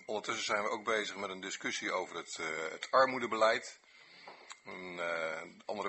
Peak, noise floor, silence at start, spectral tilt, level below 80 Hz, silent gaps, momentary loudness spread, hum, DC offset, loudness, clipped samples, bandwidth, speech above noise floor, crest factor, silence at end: -14 dBFS; -56 dBFS; 0 s; -2 dB/octave; -80 dBFS; none; 19 LU; none; under 0.1%; -35 LUFS; under 0.1%; 8.2 kHz; 20 dB; 22 dB; 0 s